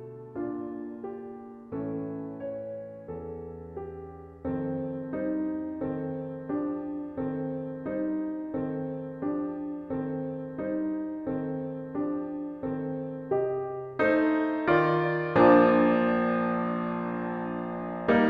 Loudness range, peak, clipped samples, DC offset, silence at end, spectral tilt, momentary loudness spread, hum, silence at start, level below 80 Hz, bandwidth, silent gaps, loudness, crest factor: 13 LU; -8 dBFS; under 0.1%; under 0.1%; 0 s; -9.5 dB/octave; 15 LU; none; 0 s; -60 dBFS; 5.2 kHz; none; -29 LUFS; 22 dB